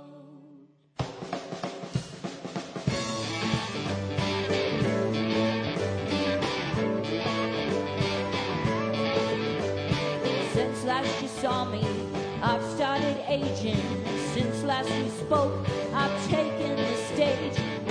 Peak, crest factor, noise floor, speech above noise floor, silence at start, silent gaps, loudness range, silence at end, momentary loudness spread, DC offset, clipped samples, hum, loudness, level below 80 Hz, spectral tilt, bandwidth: -12 dBFS; 18 dB; -55 dBFS; 27 dB; 0 s; none; 4 LU; 0 s; 8 LU; under 0.1%; under 0.1%; none; -29 LUFS; -54 dBFS; -5.5 dB/octave; 10.5 kHz